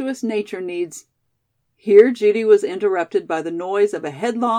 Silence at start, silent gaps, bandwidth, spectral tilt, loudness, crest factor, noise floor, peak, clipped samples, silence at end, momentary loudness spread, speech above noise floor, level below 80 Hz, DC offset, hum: 0 s; none; 10.5 kHz; -5 dB/octave; -18 LUFS; 18 dB; -71 dBFS; 0 dBFS; under 0.1%; 0 s; 14 LU; 54 dB; -78 dBFS; under 0.1%; none